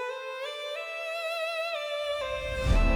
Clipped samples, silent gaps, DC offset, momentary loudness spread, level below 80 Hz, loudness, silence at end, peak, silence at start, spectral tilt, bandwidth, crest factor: under 0.1%; none; under 0.1%; 6 LU; -34 dBFS; -32 LUFS; 0 s; -12 dBFS; 0 s; -5 dB/octave; 15 kHz; 18 dB